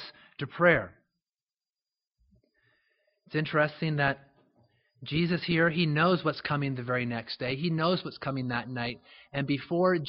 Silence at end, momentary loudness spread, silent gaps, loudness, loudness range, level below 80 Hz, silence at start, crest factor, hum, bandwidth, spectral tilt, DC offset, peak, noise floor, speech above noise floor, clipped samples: 0 s; 13 LU; 1.43-1.47 s, 2.07-2.11 s; -29 LUFS; 5 LU; -62 dBFS; 0 s; 22 dB; none; 5.6 kHz; -4.5 dB/octave; under 0.1%; -8 dBFS; under -90 dBFS; over 61 dB; under 0.1%